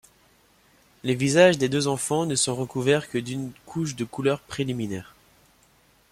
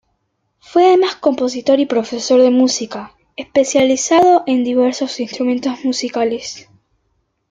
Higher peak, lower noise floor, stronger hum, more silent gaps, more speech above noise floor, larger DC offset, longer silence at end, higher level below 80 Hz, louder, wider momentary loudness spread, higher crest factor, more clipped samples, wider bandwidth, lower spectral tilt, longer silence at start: second, -6 dBFS vs -2 dBFS; second, -60 dBFS vs -68 dBFS; neither; neither; second, 36 dB vs 53 dB; neither; first, 1.1 s vs 0.9 s; about the same, -60 dBFS vs -60 dBFS; second, -24 LUFS vs -15 LUFS; about the same, 15 LU vs 14 LU; first, 20 dB vs 14 dB; neither; first, 16 kHz vs 9.4 kHz; first, -4.5 dB/octave vs -3 dB/octave; first, 1.05 s vs 0.7 s